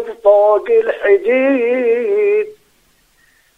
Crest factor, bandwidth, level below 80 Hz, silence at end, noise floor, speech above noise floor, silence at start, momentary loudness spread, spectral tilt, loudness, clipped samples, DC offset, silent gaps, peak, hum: 14 dB; 4.5 kHz; -60 dBFS; 1.05 s; -56 dBFS; 43 dB; 0 s; 4 LU; -5.5 dB/octave; -13 LUFS; under 0.1%; under 0.1%; none; 0 dBFS; none